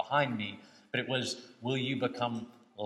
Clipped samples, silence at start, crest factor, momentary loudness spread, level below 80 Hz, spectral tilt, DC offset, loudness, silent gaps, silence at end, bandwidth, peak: under 0.1%; 0 s; 20 dB; 11 LU; -80 dBFS; -5 dB/octave; under 0.1%; -34 LUFS; none; 0 s; 12.5 kHz; -14 dBFS